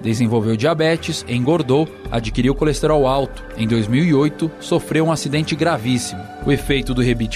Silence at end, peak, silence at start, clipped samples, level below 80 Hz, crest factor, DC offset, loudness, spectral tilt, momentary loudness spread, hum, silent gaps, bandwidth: 0 s; -4 dBFS; 0 s; under 0.1%; -34 dBFS; 14 dB; under 0.1%; -18 LUFS; -6 dB/octave; 6 LU; none; none; 14.5 kHz